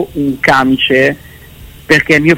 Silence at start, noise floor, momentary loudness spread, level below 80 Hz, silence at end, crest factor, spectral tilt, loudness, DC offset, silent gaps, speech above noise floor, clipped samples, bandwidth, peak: 0 s; -34 dBFS; 7 LU; -38 dBFS; 0 s; 12 dB; -5 dB/octave; -10 LUFS; under 0.1%; none; 24 dB; under 0.1%; 16.5 kHz; 0 dBFS